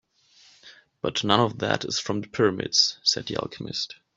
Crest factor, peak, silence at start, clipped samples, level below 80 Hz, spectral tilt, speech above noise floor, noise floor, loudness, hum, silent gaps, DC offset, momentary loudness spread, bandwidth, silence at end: 24 dB; -4 dBFS; 0.65 s; under 0.1%; -62 dBFS; -3.5 dB/octave; 32 dB; -58 dBFS; -24 LUFS; none; none; under 0.1%; 11 LU; 8 kHz; 0.25 s